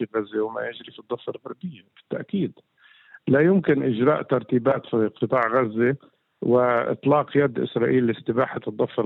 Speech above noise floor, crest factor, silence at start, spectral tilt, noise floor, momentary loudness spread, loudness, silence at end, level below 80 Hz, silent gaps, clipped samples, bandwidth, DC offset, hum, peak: 29 dB; 16 dB; 0 s; -10 dB/octave; -52 dBFS; 14 LU; -23 LUFS; 0 s; -68 dBFS; none; under 0.1%; 4.2 kHz; under 0.1%; none; -8 dBFS